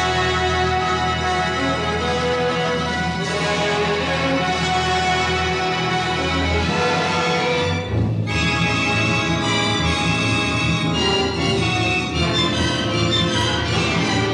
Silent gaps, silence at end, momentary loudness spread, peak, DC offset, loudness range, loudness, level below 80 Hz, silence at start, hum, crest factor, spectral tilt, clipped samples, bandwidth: none; 0 s; 3 LU; -4 dBFS; under 0.1%; 2 LU; -19 LUFS; -36 dBFS; 0 s; none; 14 dB; -4.5 dB/octave; under 0.1%; 11 kHz